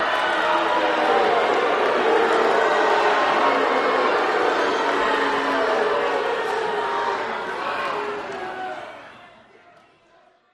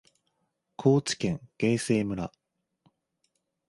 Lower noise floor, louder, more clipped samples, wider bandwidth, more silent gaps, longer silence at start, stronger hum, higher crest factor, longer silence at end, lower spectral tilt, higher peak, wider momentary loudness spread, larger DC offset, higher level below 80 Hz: second, -56 dBFS vs -78 dBFS; first, -20 LUFS vs -28 LUFS; neither; about the same, 12.5 kHz vs 11.5 kHz; neither; second, 0 s vs 0.8 s; neither; about the same, 16 dB vs 20 dB; second, 1.25 s vs 1.4 s; second, -3 dB/octave vs -5.5 dB/octave; first, -6 dBFS vs -10 dBFS; about the same, 10 LU vs 9 LU; neither; about the same, -62 dBFS vs -60 dBFS